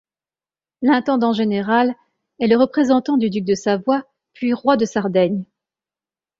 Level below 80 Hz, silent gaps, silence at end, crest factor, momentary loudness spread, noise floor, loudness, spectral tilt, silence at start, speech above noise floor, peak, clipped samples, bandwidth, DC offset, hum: -60 dBFS; none; 0.95 s; 18 dB; 7 LU; under -90 dBFS; -18 LUFS; -6 dB/octave; 0.8 s; over 73 dB; -2 dBFS; under 0.1%; 7.6 kHz; under 0.1%; none